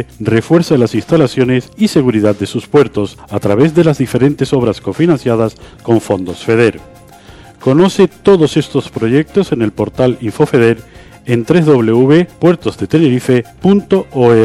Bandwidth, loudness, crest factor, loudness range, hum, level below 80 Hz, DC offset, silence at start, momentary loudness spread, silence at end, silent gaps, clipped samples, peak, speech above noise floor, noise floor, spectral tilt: 14 kHz; -12 LUFS; 12 dB; 2 LU; none; -42 dBFS; under 0.1%; 0 s; 7 LU; 0 s; none; under 0.1%; 0 dBFS; 26 dB; -37 dBFS; -7 dB/octave